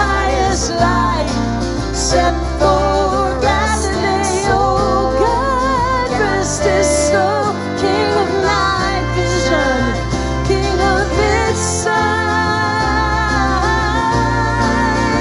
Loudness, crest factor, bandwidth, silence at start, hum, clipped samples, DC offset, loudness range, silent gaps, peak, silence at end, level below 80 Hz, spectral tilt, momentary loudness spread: -15 LUFS; 12 dB; 11.5 kHz; 0 s; none; under 0.1%; under 0.1%; 1 LU; none; -2 dBFS; 0 s; -24 dBFS; -4.5 dB/octave; 3 LU